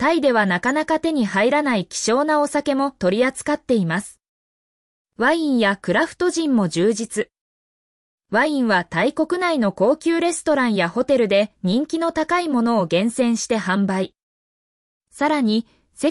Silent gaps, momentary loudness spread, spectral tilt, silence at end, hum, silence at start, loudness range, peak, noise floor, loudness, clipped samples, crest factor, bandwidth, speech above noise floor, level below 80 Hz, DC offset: 4.29-5.05 s, 7.41-8.18 s, 14.23-15.01 s; 5 LU; -5 dB/octave; 0 s; none; 0 s; 3 LU; -6 dBFS; under -90 dBFS; -20 LUFS; under 0.1%; 14 dB; 12 kHz; over 71 dB; -58 dBFS; under 0.1%